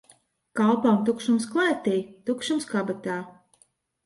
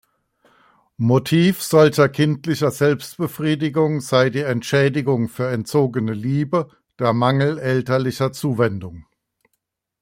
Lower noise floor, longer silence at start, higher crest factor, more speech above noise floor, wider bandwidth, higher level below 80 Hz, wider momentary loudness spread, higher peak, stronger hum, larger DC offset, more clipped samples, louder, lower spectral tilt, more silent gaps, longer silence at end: second, -65 dBFS vs -75 dBFS; second, 0.55 s vs 1 s; about the same, 16 dB vs 18 dB; second, 40 dB vs 56 dB; second, 11.5 kHz vs 16.5 kHz; second, -70 dBFS vs -58 dBFS; first, 11 LU vs 8 LU; second, -10 dBFS vs -2 dBFS; neither; neither; neither; second, -25 LUFS vs -19 LUFS; about the same, -5.5 dB/octave vs -6.5 dB/octave; neither; second, 0.75 s vs 1 s